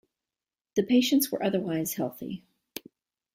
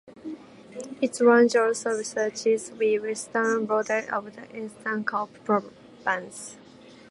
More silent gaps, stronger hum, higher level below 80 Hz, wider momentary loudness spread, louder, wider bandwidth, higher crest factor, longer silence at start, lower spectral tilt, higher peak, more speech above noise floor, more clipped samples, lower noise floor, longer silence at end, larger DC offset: neither; neither; about the same, -70 dBFS vs -74 dBFS; about the same, 20 LU vs 21 LU; about the same, -27 LUFS vs -25 LUFS; first, 16 kHz vs 11.5 kHz; about the same, 18 dB vs 20 dB; first, 0.75 s vs 0.05 s; about the same, -4.5 dB/octave vs -4 dB/octave; second, -12 dBFS vs -6 dBFS; first, over 63 dB vs 24 dB; neither; first, under -90 dBFS vs -49 dBFS; about the same, 0.55 s vs 0.55 s; neither